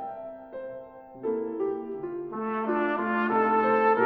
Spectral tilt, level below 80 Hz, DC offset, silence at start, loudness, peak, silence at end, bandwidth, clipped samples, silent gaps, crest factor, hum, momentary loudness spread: -8.5 dB/octave; -68 dBFS; under 0.1%; 0 s; -27 LUFS; -8 dBFS; 0 s; 5.4 kHz; under 0.1%; none; 18 dB; none; 18 LU